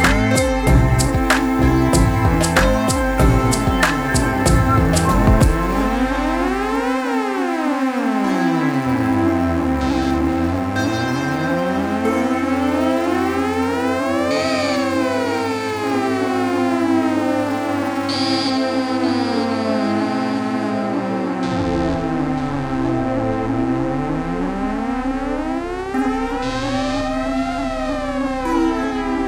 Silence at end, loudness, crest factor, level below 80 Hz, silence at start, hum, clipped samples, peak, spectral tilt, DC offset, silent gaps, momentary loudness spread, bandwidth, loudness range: 0 s; -19 LUFS; 16 dB; -28 dBFS; 0 s; none; under 0.1%; -2 dBFS; -5.5 dB/octave; under 0.1%; none; 6 LU; over 20 kHz; 5 LU